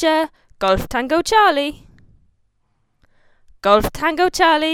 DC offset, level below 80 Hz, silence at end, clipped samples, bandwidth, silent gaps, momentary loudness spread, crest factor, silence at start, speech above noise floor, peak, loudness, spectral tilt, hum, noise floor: under 0.1%; -40 dBFS; 0 s; under 0.1%; 17.5 kHz; none; 9 LU; 18 dB; 0 s; 48 dB; 0 dBFS; -17 LUFS; -3.5 dB/octave; none; -65 dBFS